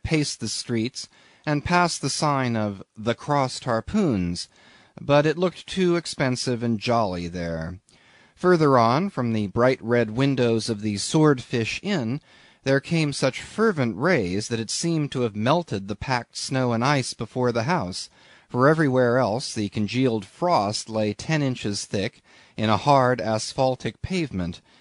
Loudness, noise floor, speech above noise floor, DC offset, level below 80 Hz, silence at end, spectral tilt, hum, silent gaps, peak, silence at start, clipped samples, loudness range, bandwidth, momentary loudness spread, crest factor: -24 LUFS; -55 dBFS; 32 dB; under 0.1%; -52 dBFS; 0.25 s; -5.5 dB/octave; none; none; -4 dBFS; 0.05 s; under 0.1%; 3 LU; 11 kHz; 11 LU; 18 dB